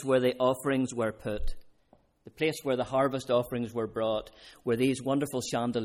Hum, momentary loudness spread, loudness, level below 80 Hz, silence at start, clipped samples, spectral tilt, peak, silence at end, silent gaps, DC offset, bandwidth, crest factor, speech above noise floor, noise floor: none; 9 LU; -30 LUFS; -44 dBFS; 0 s; under 0.1%; -5.5 dB/octave; -14 dBFS; 0 s; none; under 0.1%; 16 kHz; 16 dB; 35 dB; -65 dBFS